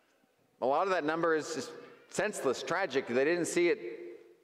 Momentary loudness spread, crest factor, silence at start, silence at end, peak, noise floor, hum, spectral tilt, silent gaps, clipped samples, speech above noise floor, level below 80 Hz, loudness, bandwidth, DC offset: 15 LU; 16 dB; 0.6 s; 0.25 s; -16 dBFS; -70 dBFS; none; -4 dB/octave; none; under 0.1%; 39 dB; -78 dBFS; -32 LUFS; 15 kHz; under 0.1%